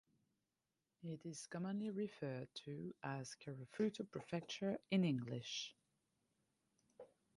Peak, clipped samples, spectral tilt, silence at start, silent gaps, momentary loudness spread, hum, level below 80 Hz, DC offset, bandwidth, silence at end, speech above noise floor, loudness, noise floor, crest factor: -28 dBFS; under 0.1%; -5.5 dB/octave; 1 s; none; 13 LU; none; -84 dBFS; under 0.1%; 11.5 kHz; 0.3 s; over 45 dB; -45 LUFS; under -90 dBFS; 20 dB